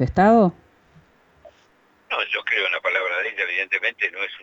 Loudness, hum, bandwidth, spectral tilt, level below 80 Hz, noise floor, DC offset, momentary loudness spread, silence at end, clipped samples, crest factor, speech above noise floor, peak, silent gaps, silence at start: -21 LUFS; none; 7.8 kHz; -6.5 dB/octave; -48 dBFS; -58 dBFS; under 0.1%; 9 LU; 0 s; under 0.1%; 16 dB; 38 dB; -6 dBFS; none; 0 s